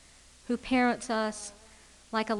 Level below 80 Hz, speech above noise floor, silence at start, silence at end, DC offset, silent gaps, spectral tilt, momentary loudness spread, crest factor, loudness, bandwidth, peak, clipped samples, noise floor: -58 dBFS; 26 dB; 0.5 s; 0 s; under 0.1%; none; -3.5 dB/octave; 16 LU; 18 dB; -30 LUFS; 11.5 kHz; -14 dBFS; under 0.1%; -56 dBFS